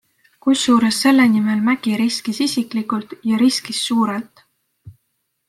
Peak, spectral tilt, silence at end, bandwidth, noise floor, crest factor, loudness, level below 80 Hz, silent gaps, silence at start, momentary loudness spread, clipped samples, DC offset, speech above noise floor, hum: -2 dBFS; -4 dB/octave; 0.6 s; 14.5 kHz; -71 dBFS; 16 dB; -17 LUFS; -64 dBFS; none; 0.45 s; 9 LU; under 0.1%; under 0.1%; 54 dB; none